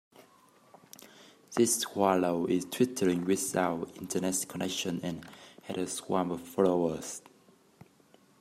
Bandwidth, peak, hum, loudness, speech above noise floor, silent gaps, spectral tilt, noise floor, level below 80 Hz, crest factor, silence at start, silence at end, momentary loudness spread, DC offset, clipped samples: 16 kHz; -10 dBFS; none; -31 LUFS; 32 dB; none; -4 dB/octave; -63 dBFS; -72 dBFS; 22 dB; 0.2 s; 1.2 s; 16 LU; under 0.1%; under 0.1%